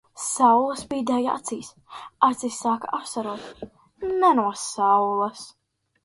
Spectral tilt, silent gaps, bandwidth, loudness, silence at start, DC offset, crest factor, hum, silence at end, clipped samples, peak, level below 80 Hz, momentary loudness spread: -3.5 dB/octave; none; 12 kHz; -23 LUFS; 0.15 s; under 0.1%; 22 dB; none; 0.55 s; under 0.1%; -2 dBFS; -64 dBFS; 22 LU